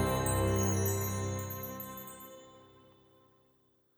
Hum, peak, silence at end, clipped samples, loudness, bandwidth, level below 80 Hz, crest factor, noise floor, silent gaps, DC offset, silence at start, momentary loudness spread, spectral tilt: none; -18 dBFS; 1.3 s; under 0.1%; -33 LUFS; over 20 kHz; -50 dBFS; 18 dB; -71 dBFS; none; under 0.1%; 0 s; 18 LU; -5 dB/octave